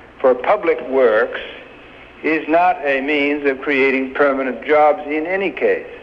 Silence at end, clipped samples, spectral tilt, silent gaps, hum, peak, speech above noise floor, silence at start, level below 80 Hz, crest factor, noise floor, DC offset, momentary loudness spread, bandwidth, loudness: 0 s; under 0.1%; -6.5 dB/octave; none; none; -4 dBFS; 24 dB; 0 s; -54 dBFS; 14 dB; -40 dBFS; under 0.1%; 7 LU; 6.6 kHz; -17 LUFS